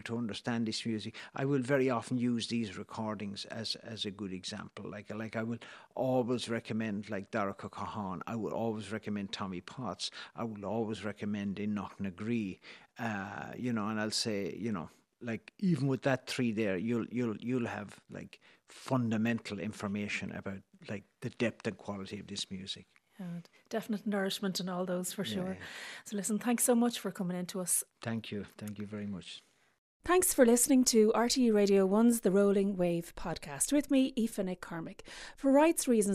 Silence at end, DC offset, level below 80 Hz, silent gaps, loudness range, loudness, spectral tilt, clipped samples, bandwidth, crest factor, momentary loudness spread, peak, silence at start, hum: 0 s; under 0.1%; -64 dBFS; 29.78-30.00 s; 10 LU; -33 LUFS; -4.5 dB/octave; under 0.1%; 14.5 kHz; 22 dB; 17 LU; -12 dBFS; 0.05 s; none